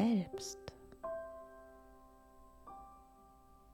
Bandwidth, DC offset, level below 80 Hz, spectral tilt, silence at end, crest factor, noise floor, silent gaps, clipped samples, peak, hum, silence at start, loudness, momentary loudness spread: 15.5 kHz; under 0.1%; -66 dBFS; -5.5 dB/octave; 0 s; 20 dB; -62 dBFS; none; under 0.1%; -22 dBFS; none; 0 s; -44 LUFS; 21 LU